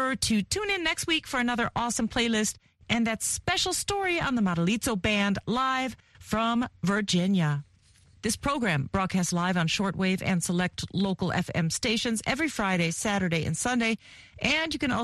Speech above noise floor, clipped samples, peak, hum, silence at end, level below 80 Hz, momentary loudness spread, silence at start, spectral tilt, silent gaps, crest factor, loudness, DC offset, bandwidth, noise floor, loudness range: 32 dB; under 0.1%; -10 dBFS; none; 0 s; -50 dBFS; 4 LU; 0 s; -4 dB/octave; none; 18 dB; -27 LUFS; under 0.1%; 12.5 kHz; -59 dBFS; 1 LU